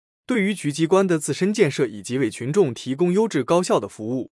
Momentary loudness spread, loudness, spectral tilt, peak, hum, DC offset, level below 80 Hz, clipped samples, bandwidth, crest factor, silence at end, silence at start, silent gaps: 6 LU; -21 LUFS; -5.5 dB/octave; -4 dBFS; none; under 0.1%; -70 dBFS; under 0.1%; 12 kHz; 16 dB; 0.1 s; 0.3 s; none